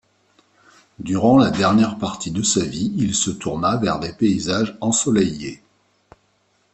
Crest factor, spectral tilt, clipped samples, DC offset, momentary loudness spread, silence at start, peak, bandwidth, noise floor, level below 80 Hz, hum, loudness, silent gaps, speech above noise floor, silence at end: 18 dB; -4.5 dB/octave; under 0.1%; under 0.1%; 10 LU; 1 s; -2 dBFS; 8.8 kHz; -63 dBFS; -50 dBFS; none; -19 LUFS; none; 44 dB; 1.2 s